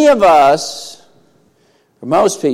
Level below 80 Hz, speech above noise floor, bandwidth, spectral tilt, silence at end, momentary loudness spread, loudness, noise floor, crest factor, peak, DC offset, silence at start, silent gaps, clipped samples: -48 dBFS; 44 dB; 15.5 kHz; -4 dB/octave; 0 s; 22 LU; -11 LUFS; -55 dBFS; 12 dB; -2 dBFS; under 0.1%; 0 s; none; under 0.1%